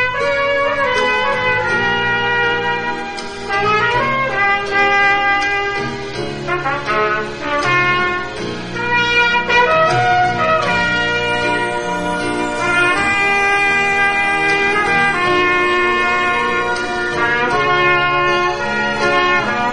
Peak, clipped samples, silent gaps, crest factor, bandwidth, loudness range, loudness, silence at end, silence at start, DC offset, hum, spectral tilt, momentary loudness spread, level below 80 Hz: -2 dBFS; under 0.1%; none; 14 dB; 11.5 kHz; 3 LU; -15 LUFS; 0 s; 0 s; 1%; none; -4 dB/octave; 7 LU; -42 dBFS